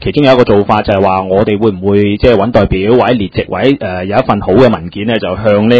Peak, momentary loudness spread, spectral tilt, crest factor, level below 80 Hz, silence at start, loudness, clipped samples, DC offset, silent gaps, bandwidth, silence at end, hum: 0 dBFS; 6 LU; -8.5 dB/octave; 10 dB; -28 dBFS; 0 s; -10 LUFS; 1%; 0.5%; none; 8 kHz; 0 s; none